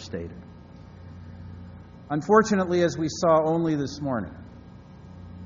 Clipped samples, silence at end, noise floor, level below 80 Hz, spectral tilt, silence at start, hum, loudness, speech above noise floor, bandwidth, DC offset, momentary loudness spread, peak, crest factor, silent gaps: under 0.1%; 0 s; -46 dBFS; -54 dBFS; -6 dB/octave; 0 s; none; -24 LUFS; 22 dB; 7.4 kHz; under 0.1%; 25 LU; -6 dBFS; 20 dB; none